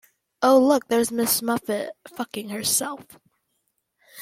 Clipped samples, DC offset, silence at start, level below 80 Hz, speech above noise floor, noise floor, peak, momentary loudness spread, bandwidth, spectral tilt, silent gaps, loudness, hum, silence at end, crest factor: under 0.1%; under 0.1%; 0.4 s; -66 dBFS; 52 dB; -74 dBFS; -6 dBFS; 16 LU; 16.5 kHz; -3 dB/octave; none; -22 LUFS; none; 0 s; 18 dB